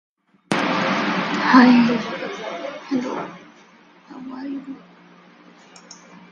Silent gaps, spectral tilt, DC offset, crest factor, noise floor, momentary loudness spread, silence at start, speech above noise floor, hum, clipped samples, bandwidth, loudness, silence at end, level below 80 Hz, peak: none; -5.5 dB/octave; under 0.1%; 22 dB; -50 dBFS; 23 LU; 0.5 s; 32 dB; none; under 0.1%; 11 kHz; -19 LUFS; 0.15 s; -66 dBFS; 0 dBFS